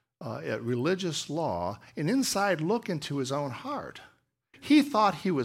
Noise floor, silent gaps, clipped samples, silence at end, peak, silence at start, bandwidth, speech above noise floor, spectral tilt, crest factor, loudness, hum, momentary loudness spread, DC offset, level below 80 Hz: -62 dBFS; none; under 0.1%; 0 s; -10 dBFS; 0.2 s; 16 kHz; 34 dB; -5 dB/octave; 18 dB; -29 LUFS; none; 13 LU; under 0.1%; -66 dBFS